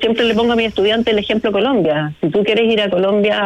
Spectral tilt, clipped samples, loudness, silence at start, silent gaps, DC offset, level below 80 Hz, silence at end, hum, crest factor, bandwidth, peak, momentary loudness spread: -6.5 dB/octave; under 0.1%; -15 LUFS; 0 s; none; under 0.1%; -46 dBFS; 0 s; none; 10 dB; 8.8 kHz; -6 dBFS; 3 LU